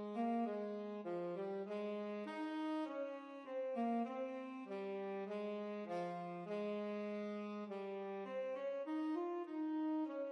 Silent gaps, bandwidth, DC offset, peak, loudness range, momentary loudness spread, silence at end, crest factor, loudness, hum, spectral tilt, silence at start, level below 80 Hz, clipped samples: none; 9.2 kHz; under 0.1%; -32 dBFS; 1 LU; 6 LU; 0 s; 12 dB; -44 LUFS; none; -7.5 dB/octave; 0 s; under -90 dBFS; under 0.1%